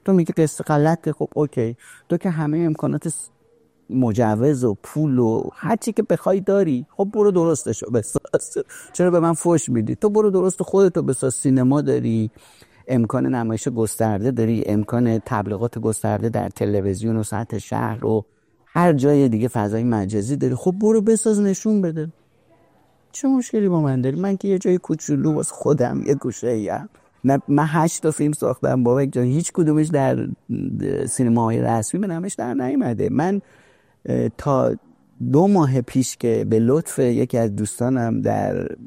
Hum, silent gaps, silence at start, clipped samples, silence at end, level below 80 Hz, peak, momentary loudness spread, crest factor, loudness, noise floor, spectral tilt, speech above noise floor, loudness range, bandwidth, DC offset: none; none; 0.05 s; under 0.1%; 0 s; -54 dBFS; -4 dBFS; 7 LU; 16 dB; -20 LUFS; -59 dBFS; -7 dB/octave; 39 dB; 3 LU; 16 kHz; under 0.1%